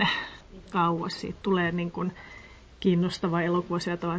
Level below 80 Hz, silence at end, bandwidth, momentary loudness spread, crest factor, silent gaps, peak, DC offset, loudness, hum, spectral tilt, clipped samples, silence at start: -54 dBFS; 0 s; 8 kHz; 16 LU; 18 dB; none; -10 dBFS; under 0.1%; -28 LUFS; none; -6.5 dB/octave; under 0.1%; 0 s